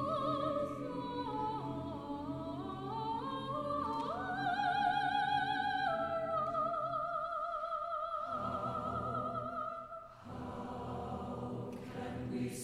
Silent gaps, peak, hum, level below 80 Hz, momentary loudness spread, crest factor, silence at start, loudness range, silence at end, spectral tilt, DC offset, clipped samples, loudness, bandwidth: none; -20 dBFS; none; -62 dBFS; 10 LU; 18 dB; 0 s; 6 LU; 0 s; -6 dB/octave; under 0.1%; under 0.1%; -38 LUFS; 15.5 kHz